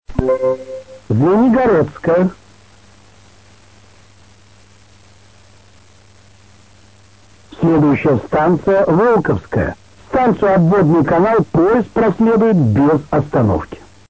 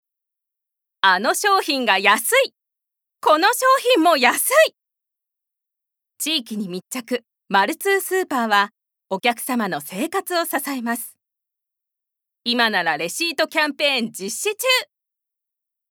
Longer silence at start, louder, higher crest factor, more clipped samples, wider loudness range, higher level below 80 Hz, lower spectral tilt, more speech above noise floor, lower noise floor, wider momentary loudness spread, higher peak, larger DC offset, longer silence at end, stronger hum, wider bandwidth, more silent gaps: second, 0.1 s vs 1.05 s; first, -14 LUFS vs -19 LUFS; about the same, 16 dB vs 20 dB; neither; about the same, 8 LU vs 7 LU; first, -38 dBFS vs -86 dBFS; first, -9.5 dB/octave vs -2 dB/octave; second, 34 dB vs 65 dB; second, -47 dBFS vs -84 dBFS; second, 8 LU vs 12 LU; about the same, 0 dBFS vs 0 dBFS; first, 0.4% vs under 0.1%; second, 0.35 s vs 1.1 s; neither; second, 8 kHz vs over 20 kHz; neither